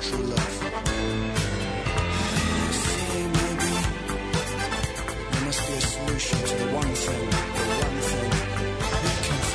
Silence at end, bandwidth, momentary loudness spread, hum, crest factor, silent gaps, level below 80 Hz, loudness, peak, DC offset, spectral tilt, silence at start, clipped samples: 0 s; 11 kHz; 3 LU; none; 18 dB; none; -34 dBFS; -26 LUFS; -8 dBFS; under 0.1%; -4 dB/octave; 0 s; under 0.1%